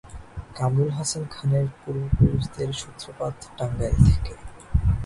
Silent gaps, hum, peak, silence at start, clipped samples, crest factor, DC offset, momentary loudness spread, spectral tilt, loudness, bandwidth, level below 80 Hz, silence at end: none; none; -2 dBFS; 0.05 s; under 0.1%; 22 dB; under 0.1%; 17 LU; -6.5 dB/octave; -25 LUFS; 11.5 kHz; -30 dBFS; 0 s